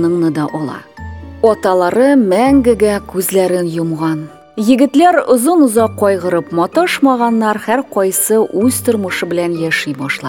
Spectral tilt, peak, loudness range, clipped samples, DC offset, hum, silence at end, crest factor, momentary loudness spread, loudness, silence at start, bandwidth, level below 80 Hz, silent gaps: -5 dB/octave; 0 dBFS; 2 LU; under 0.1%; 0.1%; none; 0 s; 12 dB; 9 LU; -13 LUFS; 0 s; 19 kHz; -42 dBFS; none